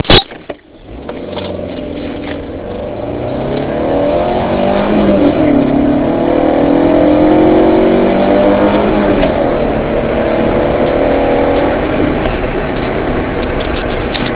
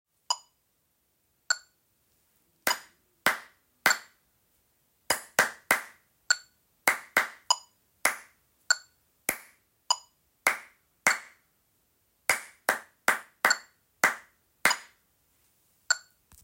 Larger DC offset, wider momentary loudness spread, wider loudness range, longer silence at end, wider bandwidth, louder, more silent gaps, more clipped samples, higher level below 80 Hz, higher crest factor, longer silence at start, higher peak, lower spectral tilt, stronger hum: neither; first, 13 LU vs 7 LU; first, 8 LU vs 3 LU; second, 0 s vs 0.45 s; second, 4 kHz vs 16.5 kHz; first, -12 LUFS vs -29 LUFS; neither; first, 0.1% vs under 0.1%; first, -26 dBFS vs -72 dBFS; second, 12 dB vs 28 dB; second, 0.05 s vs 0.3 s; first, 0 dBFS vs -4 dBFS; first, -10.5 dB/octave vs 0.5 dB/octave; neither